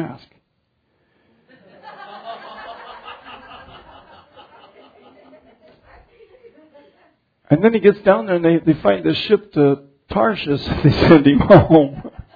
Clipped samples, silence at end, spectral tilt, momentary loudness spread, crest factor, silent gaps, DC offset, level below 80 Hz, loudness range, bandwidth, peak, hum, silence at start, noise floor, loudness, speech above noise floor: under 0.1%; 0.15 s; -9.5 dB/octave; 25 LU; 18 dB; none; under 0.1%; -42 dBFS; 24 LU; 5 kHz; 0 dBFS; none; 0 s; -68 dBFS; -15 LUFS; 54 dB